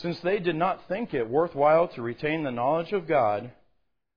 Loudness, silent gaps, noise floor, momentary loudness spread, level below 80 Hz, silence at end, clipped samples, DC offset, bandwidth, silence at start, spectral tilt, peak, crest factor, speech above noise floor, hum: -26 LUFS; none; -73 dBFS; 9 LU; -60 dBFS; 0.65 s; under 0.1%; 0.1%; 5.2 kHz; 0 s; -8.5 dB/octave; -10 dBFS; 16 dB; 47 dB; none